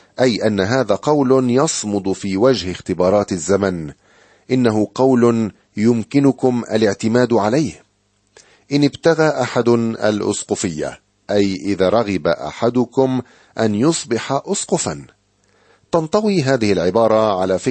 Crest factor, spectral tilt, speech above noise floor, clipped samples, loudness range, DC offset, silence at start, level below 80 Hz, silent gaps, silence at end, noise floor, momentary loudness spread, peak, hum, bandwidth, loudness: 16 dB; -5.5 dB/octave; 46 dB; under 0.1%; 3 LU; under 0.1%; 0.2 s; -52 dBFS; none; 0 s; -62 dBFS; 7 LU; -2 dBFS; none; 8.8 kHz; -17 LUFS